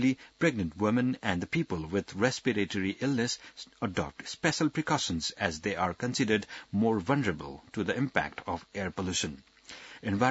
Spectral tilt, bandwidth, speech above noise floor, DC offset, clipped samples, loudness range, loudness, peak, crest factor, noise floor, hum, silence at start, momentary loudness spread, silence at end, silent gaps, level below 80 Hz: -4.5 dB/octave; 8 kHz; 19 dB; under 0.1%; under 0.1%; 2 LU; -31 LUFS; -8 dBFS; 24 dB; -49 dBFS; none; 0 s; 10 LU; 0 s; none; -60 dBFS